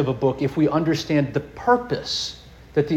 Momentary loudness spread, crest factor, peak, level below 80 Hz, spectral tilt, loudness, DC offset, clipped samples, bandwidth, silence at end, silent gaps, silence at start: 6 LU; 16 dB; -6 dBFS; -48 dBFS; -6 dB/octave; -22 LUFS; under 0.1%; under 0.1%; 13 kHz; 0 s; none; 0 s